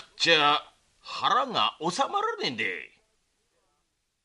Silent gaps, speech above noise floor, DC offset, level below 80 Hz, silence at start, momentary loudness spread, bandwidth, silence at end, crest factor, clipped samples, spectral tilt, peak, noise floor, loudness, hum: none; 50 dB; under 0.1%; -74 dBFS; 0 s; 10 LU; 11.5 kHz; 1.4 s; 22 dB; under 0.1%; -2.5 dB/octave; -8 dBFS; -76 dBFS; -25 LUFS; none